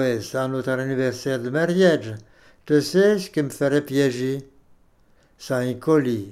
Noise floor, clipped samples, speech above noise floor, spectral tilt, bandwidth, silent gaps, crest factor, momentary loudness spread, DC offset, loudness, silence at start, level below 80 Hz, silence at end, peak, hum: -57 dBFS; under 0.1%; 36 dB; -6 dB/octave; 15 kHz; none; 16 dB; 9 LU; under 0.1%; -22 LUFS; 0 s; -62 dBFS; 0 s; -6 dBFS; none